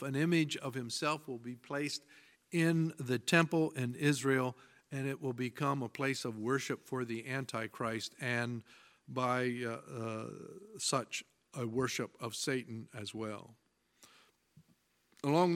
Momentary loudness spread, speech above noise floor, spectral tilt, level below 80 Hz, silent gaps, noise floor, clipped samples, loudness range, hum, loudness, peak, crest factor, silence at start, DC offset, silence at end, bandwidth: 13 LU; 38 dB; -5 dB/octave; -78 dBFS; none; -73 dBFS; under 0.1%; 7 LU; none; -36 LUFS; -12 dBFS; 24 dB; 0 s; under 0.1%; 0 s; 16.5 kHz